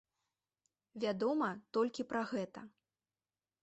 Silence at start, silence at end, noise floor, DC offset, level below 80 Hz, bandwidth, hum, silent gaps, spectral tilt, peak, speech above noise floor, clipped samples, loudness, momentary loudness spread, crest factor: 0.95 s; 0.95 s; under -90 dBFS; under 0.1%; -82 dBFS; 8.2 kHz; none; none; -6 dB/octave; -24 dBFS; over 53 dB; under 0.1%; -38 LUFS; 13 LU; 16 dB